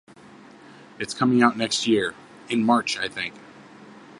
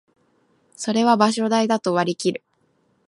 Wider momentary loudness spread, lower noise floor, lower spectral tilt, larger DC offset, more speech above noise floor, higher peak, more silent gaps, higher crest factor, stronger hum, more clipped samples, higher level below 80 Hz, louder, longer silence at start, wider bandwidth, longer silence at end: first, 13 LU vs 10 LU; second, -48 dBFS vs -65 dBFS; about the same, -4 dB/octave vs -4.5 dB/octave; neither; second, 25 dB vs 45 dB; about the same, -2 dBFS vs -2 dBFS; neither; about the same, 22 dB vs 20 dB; neither; neither; first, -66 dBFS vs -72 dBFS; second, -23 LUFS vs -20 LUFS; first, 1 s vs 0.8 s; about the same, 11.5 kHz vs 11.5 kHz; second, 0 s vs 0.7 s